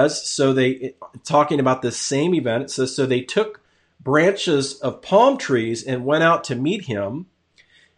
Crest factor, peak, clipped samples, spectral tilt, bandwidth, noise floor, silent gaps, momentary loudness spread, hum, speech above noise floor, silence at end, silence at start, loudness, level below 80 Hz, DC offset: 16 dB; -4 dBFS; under 0.1%; -4.5 dB/octave; 10.5 kHz; -57 dBFS; none; 11 LU; none; 37 dB; 0.75 s; 0 s; -20 LUFS; -64 dBFS; under 0.1%